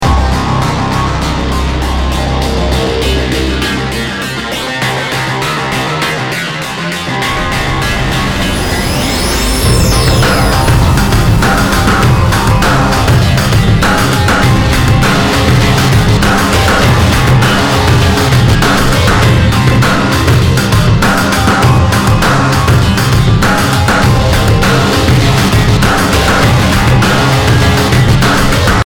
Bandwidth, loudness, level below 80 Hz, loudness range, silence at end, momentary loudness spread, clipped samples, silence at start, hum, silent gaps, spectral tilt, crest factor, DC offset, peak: 19.5 kHz; -10 LUFS; -18 dBFS; 5 LU; 0 s; 5 LU; under 0.1%; 0 s; none; none; -5 dB/octave; 8 dB; under 0.1%; 0 dBFS